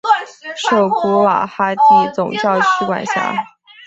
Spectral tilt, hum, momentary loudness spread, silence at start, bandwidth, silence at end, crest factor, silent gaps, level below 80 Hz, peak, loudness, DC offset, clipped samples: -4.5 dB/octave; none; 10 LU; 0.05 s; 8.2 kHz; 0.4 s; 14 dB; none; -60 dBFS; 0 dBFS; -15 LUFS; under 0.1%; under 0.1%